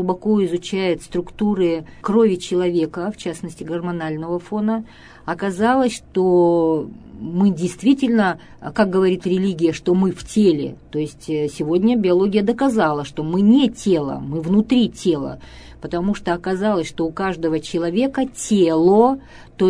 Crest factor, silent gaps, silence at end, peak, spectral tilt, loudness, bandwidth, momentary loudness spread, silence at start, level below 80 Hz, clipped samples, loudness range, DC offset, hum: 16 dB; none; 0 s; -2 dBFS; -6.5 dB/octave; -19 LUFS; 11 kHz; 11 LU; 0 s; -48 dBFS; under 0.1%; 4 LU; under 0.1%; none